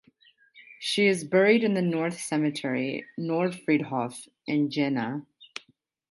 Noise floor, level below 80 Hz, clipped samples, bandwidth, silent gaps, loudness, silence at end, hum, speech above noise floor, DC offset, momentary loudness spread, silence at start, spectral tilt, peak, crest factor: -64 dBFS; -76 dBFS; under 0.1%; 11.5 kHz; none; -26 LUFS; 0.65 s; none; 38 dB; under 0.1%; 16 LU; 0.55 s; -5.5 dB/octave; -8 dBFS; 20 dB